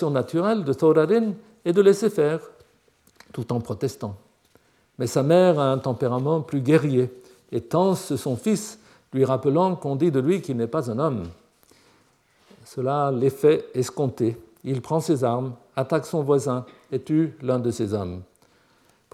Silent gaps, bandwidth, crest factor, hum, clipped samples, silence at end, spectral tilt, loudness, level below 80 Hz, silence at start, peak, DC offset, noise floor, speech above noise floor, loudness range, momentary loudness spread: none; 15 kHz; 18 dB; none; under 0.1%; 0.9 s; -7 dB/octave; -23 LUFS; -68 dBFS; 0 s; -6 dBFS; under 0.1%; -61 dBFS; 39 dB; 4 LU; 13 LU